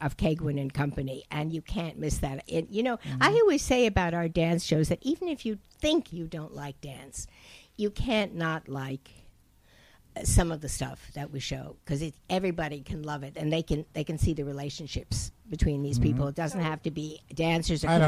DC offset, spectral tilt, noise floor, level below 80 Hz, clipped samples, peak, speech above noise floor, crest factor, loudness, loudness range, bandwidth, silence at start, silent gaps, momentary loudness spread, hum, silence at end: under 0.1%; -5.5 dB/octave; -60 dBFS; -40 dBFS; under 0.1%; -10 dBFS; 31 dB; 18 dB; -30 LUFS; 7 LU; 15.5 kHz; 0 s; none; 13 LU; none; 0 s